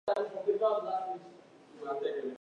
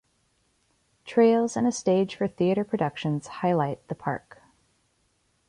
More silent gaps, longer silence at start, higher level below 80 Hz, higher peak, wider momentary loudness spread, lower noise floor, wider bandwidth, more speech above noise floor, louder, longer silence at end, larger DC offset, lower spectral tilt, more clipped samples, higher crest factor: neither; second, 0.05 s vs 1.05 s; second, -84 dBFS vs -66 dBFS; second, -18 dBFS vs -10 dBFS; first, 14 LU vs 11 LU; second, -55 dBFS vs -70 dBFS; second, 9.4 kHz vs 11 kHz; second, 22 dB vs 45 dB; second, -34 LUFS vs -26 LUFS; second, 0.05 s vs 1.3 s; neither; about the same, -5.5 dB/octave vs -6.5 dB/octave; neither; about the same, 16 dB vs 18 dB